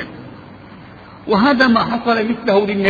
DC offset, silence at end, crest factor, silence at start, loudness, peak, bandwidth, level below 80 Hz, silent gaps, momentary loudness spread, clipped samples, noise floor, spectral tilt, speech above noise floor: under 0.1%; 0 s; 16 dB; 0 s; -15 LUFS; 0 dBFS; 7 kHz; -48 dBFS; none; 22 LU; under 0.1%; -38 dBFS; -7 dB/octave; 24 dB